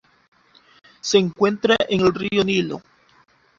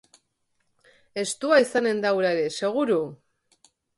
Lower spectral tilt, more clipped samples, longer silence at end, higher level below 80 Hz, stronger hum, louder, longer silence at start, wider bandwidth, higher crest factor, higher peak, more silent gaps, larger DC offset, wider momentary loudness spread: about the same, -4.5 dB/octave vs -4 dB/octave; neither; about the same, 0.8 s vs 0.85 s; first, -54 dBFS vs -74 dBFS; neither; first, -20 LUFS vs -23 LUFS; about the same, 1.05 s vs 1.15 s; second, 7.8 kHz vs 11.5 kHz; about the same, 20 dB vs 20 dB; first, -2 dBFS vs -6 dBFS; neither; neither; about the same, 12 LU vs 11 LU